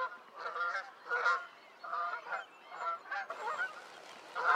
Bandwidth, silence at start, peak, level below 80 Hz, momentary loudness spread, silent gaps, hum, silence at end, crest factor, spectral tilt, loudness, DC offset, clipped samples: 13.5 kHz; 0 s; -16 dBFS; under -90 dBFS; 17 LU; none; none; 0 s; 22 dB; -0.5 dB/octave; -38 LUFS; under 0.1%; under 0.1%